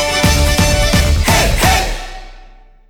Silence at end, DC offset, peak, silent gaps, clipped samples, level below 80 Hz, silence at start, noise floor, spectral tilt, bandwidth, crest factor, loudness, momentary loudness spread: 0.5 s; under 0.1%; 0 dBFS; none; under 0.1%; -18 dBFS; 0 s; -40 dBFS; -3.5 dB/octave; over 20 kHz; 12 dB; -12 LUFS; 10 LU